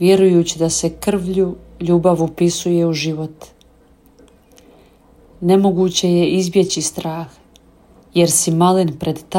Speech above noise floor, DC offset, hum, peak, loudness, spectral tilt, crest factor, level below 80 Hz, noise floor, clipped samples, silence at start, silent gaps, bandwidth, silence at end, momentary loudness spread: 34 dB; under 0.1%; none; -2 dBFS; -16 LUFS; -5 dB/octave; 14 dB; -48 dBFS; -50 dBFS; under 0.1%; 0 s; none; 16.5 kHz; 0 s; 11 LU